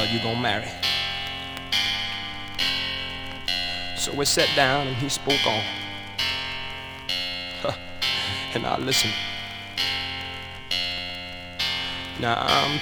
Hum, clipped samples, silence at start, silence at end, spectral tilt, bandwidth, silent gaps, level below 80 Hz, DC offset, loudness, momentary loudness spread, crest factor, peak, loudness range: none; under 0.1%; 0 s; 0 s; -2.5 dB/octave; over 20 kHz; none; -50 dBFS; under 0.1%; -25 LUFS; 11 LU; 24 dB; -4 dBFS; 4 LU